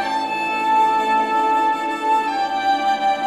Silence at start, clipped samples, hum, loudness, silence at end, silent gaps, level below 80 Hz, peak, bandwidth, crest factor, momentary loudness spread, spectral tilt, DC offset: 0 s; under 0.1%; none; -19 LUFS; 0 s; none; -70 dBFS; -8 dBFS; 12.5 kHz; 12 dB; 5 LU; -3 dB/octave; 0.2%